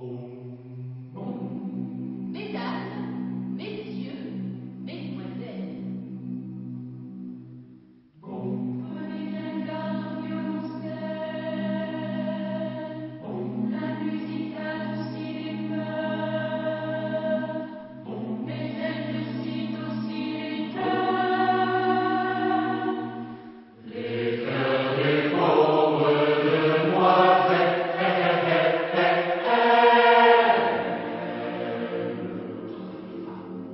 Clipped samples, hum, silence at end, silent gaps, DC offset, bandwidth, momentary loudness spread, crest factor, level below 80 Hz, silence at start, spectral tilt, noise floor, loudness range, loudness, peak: under 0.1%; none; 0 s; none; under 0.1%; 5.8 kHz; 17 LU; 20 dB; -72 dBFS; 0 s; -10.5 dB/octave; -52 dBFS; 14 LU; -26 LUFS; -6 dBFS